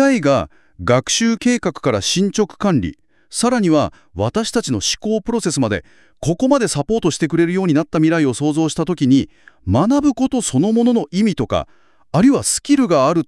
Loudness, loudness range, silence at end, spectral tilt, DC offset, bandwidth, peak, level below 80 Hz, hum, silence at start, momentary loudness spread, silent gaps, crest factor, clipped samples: -17 LUFS; 2 LU; 0.05 s; -5 dB/octave; under 0.1%; 12 kHz; -2 dBFS; -46 dBFS; none; 0 s; 8 LU; none; 14 dB; under 0.1%